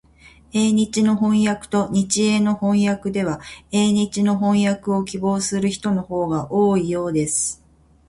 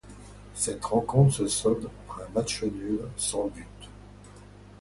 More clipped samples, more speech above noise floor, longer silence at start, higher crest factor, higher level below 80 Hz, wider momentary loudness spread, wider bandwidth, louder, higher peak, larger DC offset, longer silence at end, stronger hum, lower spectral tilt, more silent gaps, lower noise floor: neither; first, 30 dB vs 22 dB; first, 0.55 s vs 0.05 s; second, 14 dB vs 22 dB; about the same, -52 dBFS vs -50 dBFS; second, 5 LU vs 24 LU; about the same, 11.5 kHz vs 11.5 kHz; first, -20 LUFS vs -27 LUFS; about the same, -6 dBFS vs -8 dBFS; neither; first, 0.55 s vs 0.05 s; second, none vs 50 Hz at -45 dBFS; about the same, -5 dB/octave vs -5.5 dB/octave; neither; about the same, -49 dBFS vs -49 dBFS